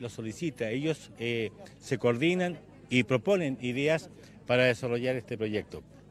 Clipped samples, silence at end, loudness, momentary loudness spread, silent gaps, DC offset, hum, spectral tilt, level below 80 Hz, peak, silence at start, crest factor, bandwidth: under 0.1%; 0.3 s; -30 LUFS; 14 LU; none; under 0.1%; none; -6 dB/octave; -64 dBFS; -10 dBFS; 0 s; 20 dB; 13.5 kHz